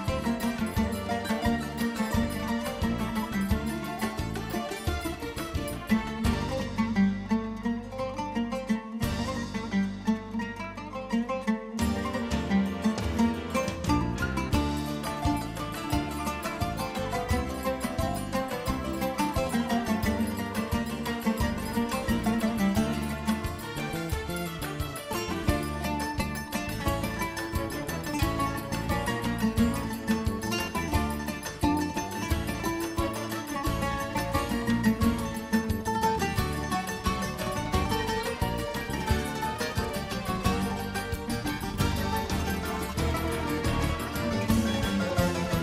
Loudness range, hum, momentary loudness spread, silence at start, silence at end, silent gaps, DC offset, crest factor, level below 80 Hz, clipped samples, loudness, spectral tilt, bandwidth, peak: 3 LU; none; 6 LU; 0 s; 0 s; none; under 0.1%; 18 dB; -40 dBFS; under 0.1%; -30 LUFS; -5.5 dB/octave; 16 kHz; -12 dBFS